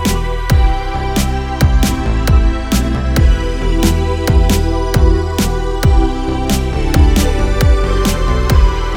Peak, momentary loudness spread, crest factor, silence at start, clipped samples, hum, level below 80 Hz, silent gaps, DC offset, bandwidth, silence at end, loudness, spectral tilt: 0 dBFS; 4 LU; 12 dB; 0 s; under 0.1%; none; -14 dBFS; none; under 0.1%; 18.5 kHz; 0 s; -14 LUFS; -5.5 dB/octave